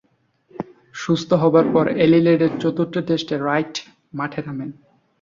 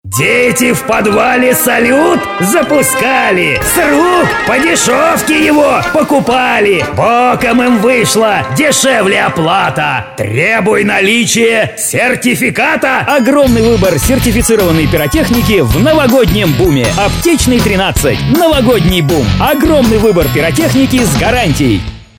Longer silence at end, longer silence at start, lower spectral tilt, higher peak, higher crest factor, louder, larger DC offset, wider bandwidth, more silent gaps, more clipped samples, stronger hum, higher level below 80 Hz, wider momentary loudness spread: first, 0.5 s vs 0.15 s; first, 0.6 s vs 0.05 s; first, -7 dB/octave vs -4.5 dB/octave; second, -4 dBFS vs 0 dBFS; first, 16 dB vs 10 dB; second, -19 LUFS vs -9 LUFS; second, under 0.1% vs 0.2%; second, 7.4 kHz vs 19 kHz; neither; neither; neither; second, -58 dBFS vs -26 dBFS; first, 19 LU vs 3 LU